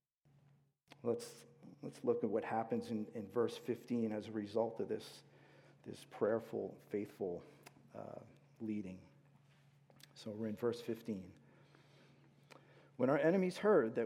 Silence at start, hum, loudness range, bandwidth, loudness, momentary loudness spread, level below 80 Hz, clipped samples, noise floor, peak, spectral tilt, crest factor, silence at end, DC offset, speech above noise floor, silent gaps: 1.05 s; none; 7 LU; 15.5 kHz; -40 LUFS; 22 LU; -86 dBFS; under 0.1%; -72 dBFS; -20 dBFS; -7 dB/octave; 20 dB; 0 s; under 0.1%; 33 dB; none